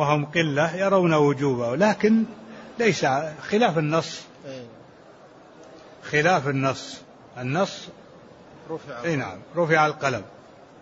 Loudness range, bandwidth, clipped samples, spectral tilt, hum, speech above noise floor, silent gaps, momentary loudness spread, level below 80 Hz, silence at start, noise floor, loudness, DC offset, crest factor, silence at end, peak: 6 LU; 8 kHz; under 0.1%; -5.5 dB/octave; none; 26 dB; none; 19 LU; -64 dBFS; 0 s; -49 dBFS; -23 LUFS; under 0.1%; 18 dB; 0.5 s; -6 dBFS